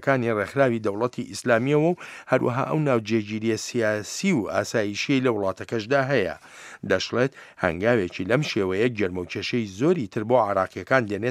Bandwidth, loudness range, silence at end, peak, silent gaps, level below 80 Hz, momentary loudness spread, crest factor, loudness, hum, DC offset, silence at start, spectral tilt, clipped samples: 14.5 kHz; 1 LU; 0 s; -2 dBFS; none; -60 dBFS; 6 LU; 20 dB; -24 LUFS; none; under 0.1%; 0 s; -5.5 dB/octave; under 0.1%